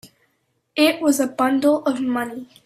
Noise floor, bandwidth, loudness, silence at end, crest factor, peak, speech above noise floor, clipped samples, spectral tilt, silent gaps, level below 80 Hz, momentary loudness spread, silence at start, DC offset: -69 dBFS; 15 kHz; -20 LUFS; 0.2 s; 18 dB; -4 dBFS; 50 dB; under 0.1%; -3 dB/octave; none; -66 dBFS; 9 LU; 0.05 s; under 0.1%